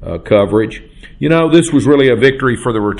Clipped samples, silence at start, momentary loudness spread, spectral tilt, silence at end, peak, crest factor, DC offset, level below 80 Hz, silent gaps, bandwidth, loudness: under 0.1%; 0 s; 9 LU; -6 dB/octave; 0 s; 0 dBFS; 12 dB; under 0.1%; -36 dBFS; none; 11.5 kHz; -12 LUFS